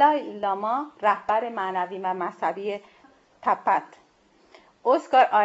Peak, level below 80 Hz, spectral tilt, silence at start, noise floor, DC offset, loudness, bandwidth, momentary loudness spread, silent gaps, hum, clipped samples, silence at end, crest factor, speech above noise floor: -6 dBFS; -74 dBFS; -5 dB/octave; 0 s; -60 dBFS; under 0.1%; -25 LUFS; 8 kHz; 9 LU; none; none; under 0.1%; 0 s; 18 dB; 36 dB